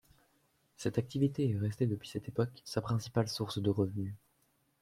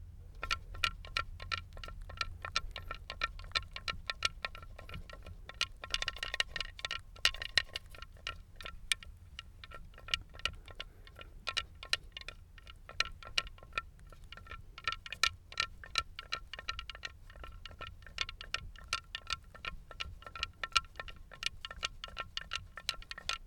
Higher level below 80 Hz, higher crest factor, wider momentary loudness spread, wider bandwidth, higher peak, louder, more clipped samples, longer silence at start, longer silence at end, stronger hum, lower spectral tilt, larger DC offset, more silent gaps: second, -66 dBFS vs -52 dBFS; second, 18 dB vs 32 dB; second, 7 LU vs 17 LU; second, 15.5 kHz vs over 20 kHz; second, -18 dBFS vs -8 dBFS; first, -35 LUFS vs -38 LUFS; neither; first, 0.8 s vs 0 s; first, 0.65 s vs 0 s; neither; first, -7 dB/octave vs -1 dB/octave; neither; neither